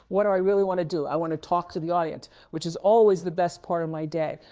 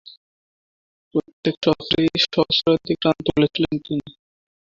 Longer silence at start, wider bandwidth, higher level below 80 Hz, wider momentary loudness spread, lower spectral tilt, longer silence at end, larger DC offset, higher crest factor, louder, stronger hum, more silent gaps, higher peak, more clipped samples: second, 0.1 s vs 1.15 s; about the same, 8 kHz vs 7.4 kHz; second, -62 dBFS vs -50 dBFS; first, 12 LU vs 9 LU; about the same, -6.5 dB/octave vs -6 dB/octave; second, 0.15 s vs 0.6 s; neither; second, 14 dB vs 20 dB; second, -25 LUFS vs -21 LUFS; neither; second, none vs 1.33-1.43 s, 1.57-1.61 s; second, -10 dBFS vs -2 dBFS; neither